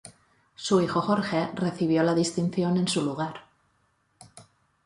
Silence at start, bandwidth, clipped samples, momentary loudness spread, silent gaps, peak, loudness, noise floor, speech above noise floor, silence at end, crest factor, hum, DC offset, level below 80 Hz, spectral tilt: 0.05 s; 11.5 kHz; under 0.1%; 10 LU; none; -10 dBFS; -26 LUFS; -69 dBFS; 44 dB; 0.45 s; 18 dB; none; under 0.1%; -66 dBFS; -5.5 dB/octave